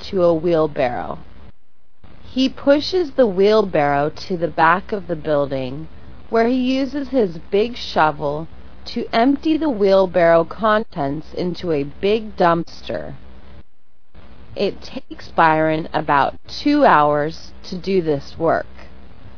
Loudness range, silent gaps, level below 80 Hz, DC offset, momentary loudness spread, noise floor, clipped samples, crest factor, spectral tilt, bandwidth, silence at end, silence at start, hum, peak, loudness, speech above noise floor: 5 LU; none; -44 dBFS; 3%; 14 LU; -62 dBFS; under 0.1%; 18 dB; -6.5 dB/octave; 5.4 kHz; 0.1 s; 0 s; none; 0 dBFS; -18 LUFS; 44 dB